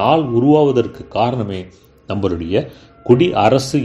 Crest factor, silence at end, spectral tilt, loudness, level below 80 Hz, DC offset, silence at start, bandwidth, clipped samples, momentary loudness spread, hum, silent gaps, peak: 16 dB; 0 s; -7 dB/octave; -16 LUFS; -44 dBFS; under 0.1%; 0 s; 12.5 kHz; under 0.1%; 14 LU; none; none; 0 dBFS